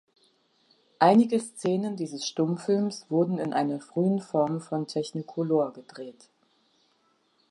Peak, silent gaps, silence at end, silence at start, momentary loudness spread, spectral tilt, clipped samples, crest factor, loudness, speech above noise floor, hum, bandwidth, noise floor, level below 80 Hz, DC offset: -6 dBFS; none; 1.4 s; 1 s; 11 LU; -6.5 dB/octave; under 0.1%; 22 dB; -27 LUFS; 42 dB; none; 11.5 kHz; -69 dBFS; -80 dBFS; under 0.1%